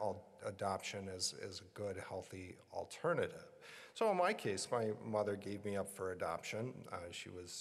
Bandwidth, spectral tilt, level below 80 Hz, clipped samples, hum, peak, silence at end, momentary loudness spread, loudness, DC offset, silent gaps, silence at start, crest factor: 14.5 kHz; -4 dB/octave; -78 dBFS; under 0.1%; none; -22 dBFS; 0 s; 12 LU; -42 LUFS; under 0.1%; none; 0 s; 20 dB